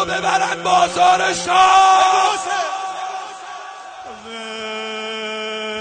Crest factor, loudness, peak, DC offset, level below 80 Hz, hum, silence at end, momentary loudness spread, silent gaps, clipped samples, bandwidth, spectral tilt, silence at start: 14 dB; -16 LUFS; -2 dBFS; under 0.1%; -56 dBFS; none; 0 s; 20 LU; none; under 0.1%; 9.4 kHz; -1.5 dB/octave; 0 s